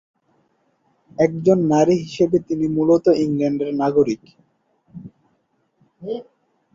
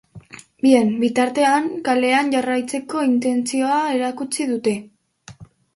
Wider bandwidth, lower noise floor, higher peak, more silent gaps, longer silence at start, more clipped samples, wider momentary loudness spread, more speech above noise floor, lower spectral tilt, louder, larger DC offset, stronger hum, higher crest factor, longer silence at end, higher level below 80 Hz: second, 7.6 kHz vs 11.5 kHz; first, -66 dBFS vs -44 dBFS; about the same, -2 dBFS vs -2 dBFS; neither; first, 1.2 s vs 0.15 s; neither; first, 21 LU vs 8 LU; first, 49 dB vs 26 dB; first, -7.5 dB/octave vs -4 dB/octave; about the same, -19 LUFS vs -19 LUFS; neither; neither; about the same, 18 dB vs 18 dB; first, 0.55 s vs 0.3 s; about the same, -58 dBFS vs -62 dBFS